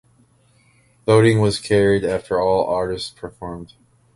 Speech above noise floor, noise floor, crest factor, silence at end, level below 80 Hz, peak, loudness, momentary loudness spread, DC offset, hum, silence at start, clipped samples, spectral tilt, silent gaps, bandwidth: 39 dB; -57 dBFS; 18 dB; 0.5 s; -46 dBFS; -2 dBFS; -18 LUFS; 18 LU; under 0.1%; none; 1.05 s; under 0.1%; -6 dB/octave; none; 11.5 kHz